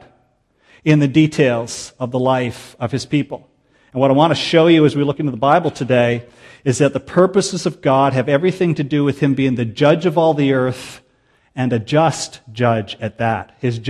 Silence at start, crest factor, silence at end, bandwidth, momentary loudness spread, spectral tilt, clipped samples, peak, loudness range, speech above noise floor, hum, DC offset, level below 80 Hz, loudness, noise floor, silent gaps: 0.85 s; 16 dB; 0 s; 12 kHz; 12 LU; -6 dB/octave; under 0.1%; 0 dBFS; 3 LU; 44 dB; none; under 0.1%; -54 dBFS; -16 LUFS; -60 dBFS; none